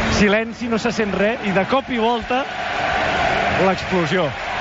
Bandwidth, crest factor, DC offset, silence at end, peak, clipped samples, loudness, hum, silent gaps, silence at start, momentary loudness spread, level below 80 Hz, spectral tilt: 8 kHz; 14 dB; under 0.1%; 0 s; -6 dBFS; under 0.1%; -19 LUFS; none; none; 0 s; 5 LU; -38 dBFS; -3.5 dB/octave